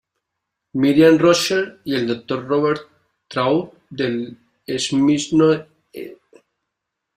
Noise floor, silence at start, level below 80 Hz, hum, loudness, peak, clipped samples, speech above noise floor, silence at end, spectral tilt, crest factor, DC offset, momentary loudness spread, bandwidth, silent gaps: -80 dBFS; 0.75 s; -58 dBFS; none; -18 LUFS; -2 dBFS; under 0.1%; 62 dB; 1.05 s; -5 dB/octave; 18 dB; under 0.1%; 21 LU; 15.5 kHz; none